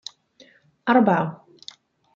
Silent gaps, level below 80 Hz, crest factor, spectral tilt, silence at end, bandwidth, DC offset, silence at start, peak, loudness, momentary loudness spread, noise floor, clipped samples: none; -70 dBFS; 20 dB; -6.5 dB/octave; 0.8 s; 7.4 kHz; under 0.1%; 0.85 s; -4 dBFS; -21 LUFS; 25 LU; -55 dBFS; under 0.1%